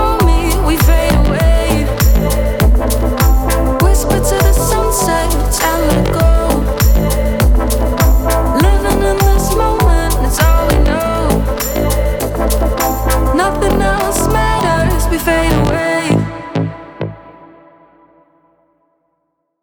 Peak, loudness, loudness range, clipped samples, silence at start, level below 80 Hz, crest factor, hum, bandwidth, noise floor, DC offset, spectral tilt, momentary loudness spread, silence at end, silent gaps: 0 dBFS; -13 LUFS; 4 LU; under 0.1%; 0 s; -14 dBFS; 12 dB; none; 19.5 kHz; -67 dBFS; under 0.1%; -5.5 dB/octave; 3 LU; 2.35 s; none